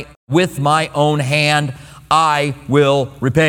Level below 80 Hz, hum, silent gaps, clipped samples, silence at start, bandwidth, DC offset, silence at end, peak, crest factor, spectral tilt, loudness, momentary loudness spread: -46 dBFS; none; 0.16-0.27 s; under 0.1%; 0 s; 16.5 kHz; under 0.1%; 0 s; 0 dBFS; 16 dB; -5.5 dB/octave; -15 LUFS; 5 LU